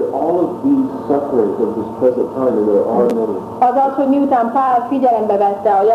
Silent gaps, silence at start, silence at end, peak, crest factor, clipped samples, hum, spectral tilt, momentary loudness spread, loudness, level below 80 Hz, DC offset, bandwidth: none; 0 s; 0 s; -2 dBFS; 14 dB; under 0.1%; none; -8.5 dB/octave; 4 LU; -15 LUFS; -56 dBFS; under 0.1%; 13 kHz